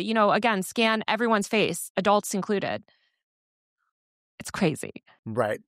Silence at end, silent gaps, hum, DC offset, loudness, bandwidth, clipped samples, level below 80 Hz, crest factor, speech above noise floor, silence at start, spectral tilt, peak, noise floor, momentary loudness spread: 0.1 s; 1.90-1.95 s, 3.23-3.76 s, 3.91-4.38 s, 5.19-5.23 s; none; under 0.1%; -25 LUFS; 15.5 kHz; under 0.1%; -66 dBFS; 18 dB; over 65 dB; 0 s; -4 dB/octave; -8 dBFS; under -90 dBFS; 14 LU